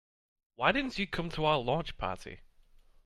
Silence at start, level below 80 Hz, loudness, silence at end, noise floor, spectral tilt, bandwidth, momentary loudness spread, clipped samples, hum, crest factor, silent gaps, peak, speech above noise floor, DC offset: 0.6 s; -50 dBFS; -32 LUFS; 0.65 s; -60 dBFS; -5.5 dB/octave; 13 kHz; 10 LU; under 0.1%; none; 24 dB; none; -10 dBFS; 28 dB; under 0.1%